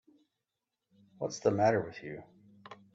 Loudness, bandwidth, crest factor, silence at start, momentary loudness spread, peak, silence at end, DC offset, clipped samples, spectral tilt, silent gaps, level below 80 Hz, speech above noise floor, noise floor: -31 LUFS; 8 kHz; 20 dB; 1.2 s; 23 LU; -14 dBFS; 0.2 s; under 0.1%; under 0.1%; -6 dB/octave; none; -72 dBFS; 57 dB; -88 dBFS